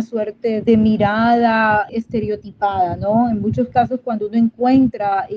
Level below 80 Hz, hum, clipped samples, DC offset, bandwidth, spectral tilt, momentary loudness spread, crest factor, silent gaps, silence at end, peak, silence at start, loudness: -46 dBFS; none; under 0.1%; under 0.1%; 5.6 kHz; -8.5 dB/octave; 8 LU; 14 dB; none; 0 s; -4 dBFS; 0 s; -17 LUFS